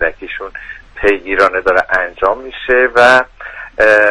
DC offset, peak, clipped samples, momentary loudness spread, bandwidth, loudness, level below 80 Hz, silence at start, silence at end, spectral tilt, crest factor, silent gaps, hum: under 0.1%; 0 dBFS; 0.2%; 18 LU; 11 kHz; -12 LUFS; -38 dBFS; 0 s; 0 s; -4 dB/octave; 12 dB; none; none